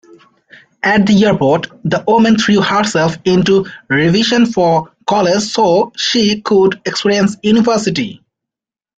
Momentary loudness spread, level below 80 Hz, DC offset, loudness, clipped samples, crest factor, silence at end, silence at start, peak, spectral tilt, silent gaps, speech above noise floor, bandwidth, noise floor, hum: 6 LU; -48 dBFS; under 0.1%; -12 LUFS; under 0.1%; 12 dB; 0.85 s; 0.85 s; 0 dBFS; -5 dB/octave; none; 73 dB; 9 kHz; -85 dBFS; none